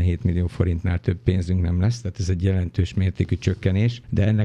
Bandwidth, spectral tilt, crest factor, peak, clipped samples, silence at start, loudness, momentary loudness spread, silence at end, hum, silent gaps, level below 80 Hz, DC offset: 8.4 kHz; -7.5 dB/octave; 16 dB; -4 dBFS; under 0.1%; 0 s; -23 LUFS; 3 LU; 0 s; none; none; -36 dBFS; under 0.1%